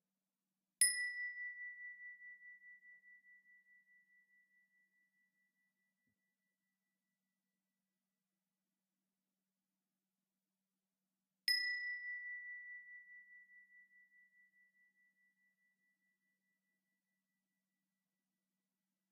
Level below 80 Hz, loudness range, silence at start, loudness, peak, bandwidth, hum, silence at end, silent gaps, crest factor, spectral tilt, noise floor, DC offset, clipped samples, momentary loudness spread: under -90 dBFS; 21 LU; 0.8 s; -40 LUFS; -18 dBFS; 5.2 kHz; none; 5.1 s; none; 32 dB; 6.5 dB/octave; under -90 dBFS; under 0.1%; under 0.1%; 26 LU